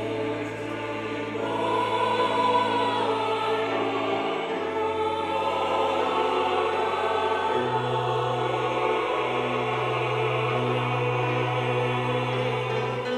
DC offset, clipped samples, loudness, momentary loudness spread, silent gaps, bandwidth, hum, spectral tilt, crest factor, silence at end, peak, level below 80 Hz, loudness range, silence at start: under 0.1%; under 0.1%; -26 LUFS; 5 LU; none; 12.5 kHz; none; -6 dB/octave; 14 dB; 0 s; -12 dBFS; -60 dBFS; 1 LU; 0 s